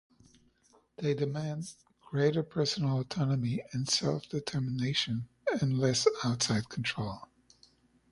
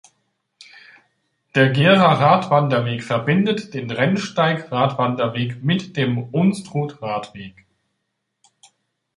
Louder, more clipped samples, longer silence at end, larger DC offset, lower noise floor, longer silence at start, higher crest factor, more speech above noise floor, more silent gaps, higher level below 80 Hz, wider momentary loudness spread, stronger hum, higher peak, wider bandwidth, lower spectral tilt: second, -32 LUFS vs -19 LUFS; neither; second, 0.85 s vs 1.65 s; neither; second, -67 dBFS vs -75 dBFS; second, 1 s vs 1.55 s; about the same, 22 dB vs 20 dB; second, 36 dB vs 57 dB; neither; about the same, -64 dBFS vs -60 dBFS; second, 9 LU vs 13 LU; neither; second, -12 dBFS vs -2 dBFS; about the same, 11.5 kHz vs 11.5 kHz; second, -5 dB/octave vs -6.5 dB/octave